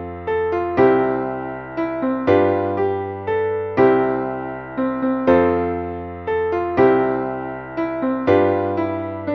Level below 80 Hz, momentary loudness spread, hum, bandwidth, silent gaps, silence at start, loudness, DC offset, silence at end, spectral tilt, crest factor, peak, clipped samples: -48 dBFS; 10 LU; none; 5.8 kHz; none; 0 s; -20 LUFS; under 0.1%; 0 s; -9 dB/octave; 16 dB; -4 dBFS; under 0.1%